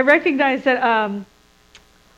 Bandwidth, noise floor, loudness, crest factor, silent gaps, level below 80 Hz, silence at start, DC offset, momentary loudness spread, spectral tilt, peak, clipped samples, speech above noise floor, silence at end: 9.2 kHz; -51 dBFS; -17 LUFS; 18 dB; none; -60 dBFS; 0 s; under 0.1%; 10 LU; -5.5 dB/octave; -2 dBFS; under 0.1%; 34 dB; 0.95 s